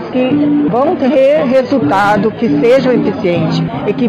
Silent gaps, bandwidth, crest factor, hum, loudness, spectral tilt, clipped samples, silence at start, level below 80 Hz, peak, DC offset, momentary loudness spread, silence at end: none; 9.2 kHz; 8 dB; none; -11 LUFS; -7.5 dB/octave; under 0.1%; 0 s; -46 dBFS; -2 dBFS; under 0.1%; 4 LU; 0 s